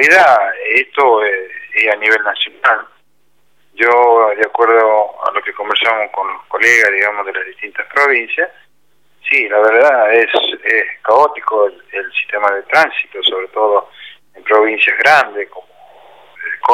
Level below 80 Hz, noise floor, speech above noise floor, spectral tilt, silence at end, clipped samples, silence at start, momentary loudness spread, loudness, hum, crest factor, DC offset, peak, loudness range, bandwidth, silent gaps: -68 dBFS; -62 dBFS; 50 dB; -1.5 dB/octave; 0 s; under 0.1%; 0 s; 11 LU; -12 LUFS; none; 14 dB; 0.2%; 0 dBFS; 2 LU; 15.5 kHz; none